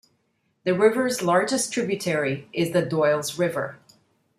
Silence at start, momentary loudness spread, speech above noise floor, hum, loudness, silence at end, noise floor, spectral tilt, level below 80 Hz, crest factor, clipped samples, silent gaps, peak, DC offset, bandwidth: 0.65 s; 7 LU; 48 dB; none; -23 LUFS; 0.65 s; -71 dBFS; -4.5 dB/octave; -68 dBFS; 18 dB; under 0.1%; none; -6 dBFS; under 0.1%; 15 kHz